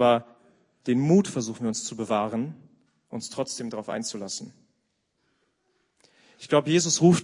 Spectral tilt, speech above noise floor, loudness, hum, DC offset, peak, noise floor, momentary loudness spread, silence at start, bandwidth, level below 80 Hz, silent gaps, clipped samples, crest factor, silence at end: -5 dB/octave; 50 dB; -26 LUFS; none; under 0.1%; -6 dBFS; -74 dBFS; 15 LU; 0 s; 11 kHz; -70 dBFS; none; under 0.1%; 20 dB; 0 s